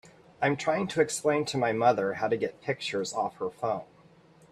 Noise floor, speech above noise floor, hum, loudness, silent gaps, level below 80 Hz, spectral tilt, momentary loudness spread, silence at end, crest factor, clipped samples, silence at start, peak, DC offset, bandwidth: -57 dBFS; 29 dB; none; -29 LUFS; none; -70 dBFS; -4.5 dB/octave; 8 LU; 0.65 s; 20 dB; under 0.1%; 0.05 s; -10 dBFS; under 0.1%; 13.5 kHz